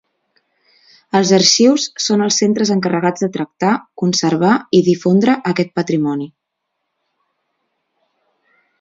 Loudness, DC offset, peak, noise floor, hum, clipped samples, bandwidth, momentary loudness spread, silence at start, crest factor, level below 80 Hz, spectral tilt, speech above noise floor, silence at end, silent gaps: -15 LUFS; under 0.1%; 0 dBFS; -75 dBFS; none; under 0.1%; 7.8 kHz; 8 LU; 1.15 s; 16 dB; -62 dBFS; -4.5 dB/octave; 61 dB; 2.55 s; none